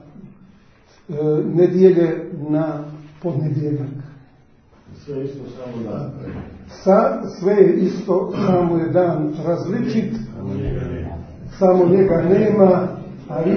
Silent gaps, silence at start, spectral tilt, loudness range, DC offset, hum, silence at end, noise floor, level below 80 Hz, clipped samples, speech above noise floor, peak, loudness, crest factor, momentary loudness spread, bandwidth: none; 0.2 s; -9.5 dB/octave; 10 LU; under 0.1%; none; 0 s; -51 dBFS; -44 dBFS; under 0.1%; 33 dB; 0 dBFS; -18 LUFS; 18 dB; 18 LU; 6.4 kHz